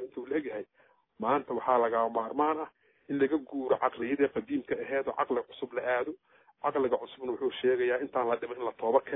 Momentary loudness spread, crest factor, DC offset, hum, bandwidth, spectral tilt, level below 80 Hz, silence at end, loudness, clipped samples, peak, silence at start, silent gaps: 9 LU; 20 dB; under 0.1%; none; 3.9 kHz; -9 dB/octave; -72 dBFS; 0 s; -31 LUFS; under 0.1%; -12 dBFS; 0 s; none